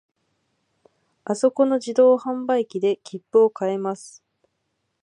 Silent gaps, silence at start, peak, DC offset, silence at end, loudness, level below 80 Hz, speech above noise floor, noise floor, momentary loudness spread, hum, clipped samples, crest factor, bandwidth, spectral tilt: none; 1.3 s; -6 dBFS; under 0.1%; 0.95 s; -21 LUFS; -80 dBFS; 54 dB; -75 dBFS; 12 LU; none; under 0.1%; 18 dB; 11 kHz; -5.5 dB/octave